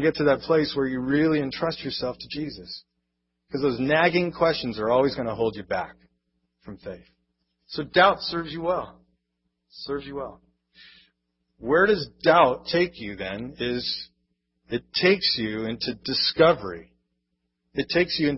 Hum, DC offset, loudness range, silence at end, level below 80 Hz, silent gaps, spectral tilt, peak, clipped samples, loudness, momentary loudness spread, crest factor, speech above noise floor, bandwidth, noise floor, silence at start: none; under 0.1%; 5 LU; 0 s; -54 dBFS; none; -8.5 dB/octave; -4 dBFS; under 0.1%; -24 LUFS; 19 LU; 20 dB; 54 dB; 6 kHz; -78 dBFS; 0 s